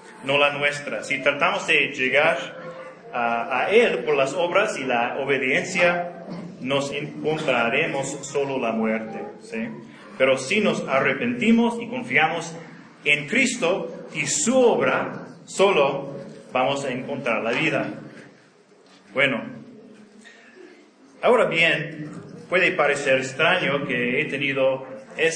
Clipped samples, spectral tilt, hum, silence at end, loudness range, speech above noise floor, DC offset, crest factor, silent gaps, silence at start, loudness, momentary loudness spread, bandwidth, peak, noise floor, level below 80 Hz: under 0.1%; -3.5 dB/octave; none; 0 s; 5 LU; 32 dB; under 0.1%; 20 dB; none; 0 s; -22 LUFS; 15 LU; 10.5 kHz; -2 dBFS; -54 dBFS; -70 dBFS